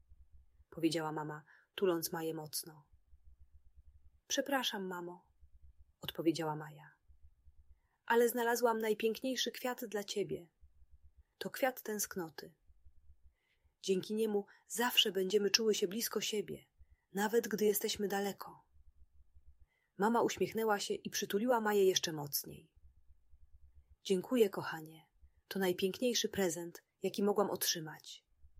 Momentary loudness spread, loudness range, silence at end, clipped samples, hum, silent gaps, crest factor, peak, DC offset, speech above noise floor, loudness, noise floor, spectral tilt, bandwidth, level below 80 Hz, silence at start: 16 LU; 8 LU; 0.15 s; under 0.1%; none; none; 28 dB; -10 dBFS; under 0.1%; 40 dB; -36 LUFS; -76 dBFS; -3 dB/octave; 16 kHz; -70 dBFS; 0.1 s